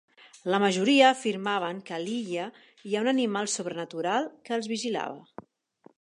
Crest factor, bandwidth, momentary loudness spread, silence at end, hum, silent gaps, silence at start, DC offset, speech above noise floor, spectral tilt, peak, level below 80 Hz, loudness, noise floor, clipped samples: 22 dB; 11.5 kHz; 14 LU; 0.8 s; none; none; 0.45 s; under 0.1%; 32 dB; -3.5 dB/octave; -6 dBFS; -80 dBFS; -27 LUFS; -60 dBFS; under 0.1%